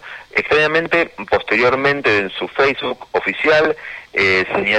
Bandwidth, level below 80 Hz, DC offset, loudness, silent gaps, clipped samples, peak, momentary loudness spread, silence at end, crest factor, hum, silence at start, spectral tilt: 9.6 kHz; -50 dBFS; under 0.1%; -16 LUFS; none; under 0.1%; -2 dBFS; 7 LU; 0 s; 16 dB; none; 0.05 s; -5 dB/octave